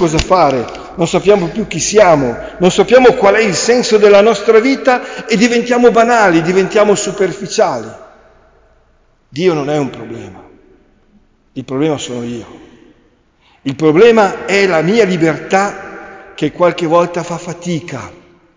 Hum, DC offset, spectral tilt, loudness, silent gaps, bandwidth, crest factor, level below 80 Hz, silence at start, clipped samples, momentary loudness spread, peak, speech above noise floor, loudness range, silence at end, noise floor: none; under 0.1%; -4.5 dB/octave; -11 LUFS; none; 7.6 kHz; 12 dB; -40 dBFS; 0 s; under 0.1%; 17 LU; 0 dBFS; 41 dB; 12 LU; 0.45 s; -52 dBFS